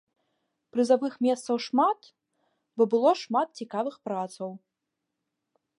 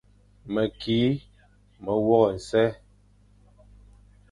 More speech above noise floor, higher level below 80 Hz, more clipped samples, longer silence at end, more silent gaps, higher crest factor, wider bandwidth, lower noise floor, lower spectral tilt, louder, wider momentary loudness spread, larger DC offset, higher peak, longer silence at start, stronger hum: first, 58 dB vs 34 dB; second, -86 dBFS vs -54 dBFS; neither; second, 1.2 s vs 1.55 s; neither; about the same, 20 dB vs 20 dB; about the same, 11.5 kHz vs 11.5 kHz; first, -84 dBFS vs -58 dBFS; second, -5 dB/octave vs -7 dB/octave; about the same, -27 LUFS vs -25 LUFS; about the same, 12 LU vs 10 LU; neither; second, -10 dBFS vs -6 dBFS; first, 0.75 s vs 0.45 s; second, none vs 50 Hz at -50 dBFS